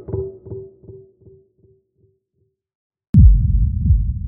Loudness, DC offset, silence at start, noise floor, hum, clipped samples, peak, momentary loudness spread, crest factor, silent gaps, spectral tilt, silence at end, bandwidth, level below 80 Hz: -16 LUFS; under 0.1%; 0.1 s; -69 dBFS; none; under 0.1%; 0 dBFS; 23 LU; 18 dB; 2.75-2.90 s, 3.09-3.13 s; -16.5 dB/octave; 0 s; 1.1 kHz; -20 dBFS